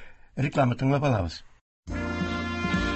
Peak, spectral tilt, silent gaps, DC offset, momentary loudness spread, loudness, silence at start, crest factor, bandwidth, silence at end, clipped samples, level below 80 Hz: -10 dBFS; -7 dB/octave; 1.61-1.83 s; under 0.1%; 13 LU; -27 LUFS; 0 s; 16 dB; 8.4 kHz; 0 s; under 0.1%; -40 dBFS